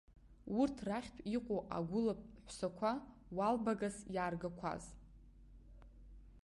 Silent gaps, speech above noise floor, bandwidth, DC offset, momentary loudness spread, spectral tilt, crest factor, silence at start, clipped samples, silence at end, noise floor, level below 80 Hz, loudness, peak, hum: none; 20 dB; 11.5 kHz; under 0.1%; 11 LU; -6.5 dB/octave; 18 dB; 0.15 s; under 0.1%; 0.05 s; -60 dBFS; -62 dBFS; -40 LUFS; -24 dBFS; none